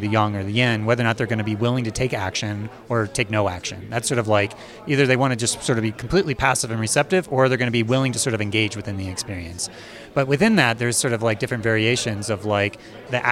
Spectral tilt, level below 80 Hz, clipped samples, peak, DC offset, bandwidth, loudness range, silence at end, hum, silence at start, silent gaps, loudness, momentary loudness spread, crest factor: -4.5 dB/octave; -48 dBFS; under 0.1%; -2 dBFS; under 0.1%; 15.5 kHz; 3 LU; 0 s; none; 0 s; none; -21 LUFS; 10 LU; 20 dB